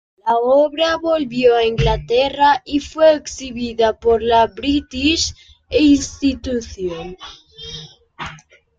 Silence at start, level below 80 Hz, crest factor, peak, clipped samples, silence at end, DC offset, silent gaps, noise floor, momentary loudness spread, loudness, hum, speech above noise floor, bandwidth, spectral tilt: 0.25 s; -36 dBFS; 16 dB; -2 dBFS; under 0.1%; 0.4 s; under 0.1%; none; -42 dBFS; 17 LU; -17 LUFS; none; 26 dB; 9.2 kHz; -4.5 dB/octave